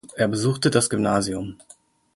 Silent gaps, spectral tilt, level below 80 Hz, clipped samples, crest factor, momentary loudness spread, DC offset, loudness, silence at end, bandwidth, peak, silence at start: none; -4.5 dB/octave; -52 dBFS; under 0.1%; 20 dB; 10 LU; under 0.1%; -22 LUFS; 0.6 s; 12 kHz; -4 dBFS; 0.05 s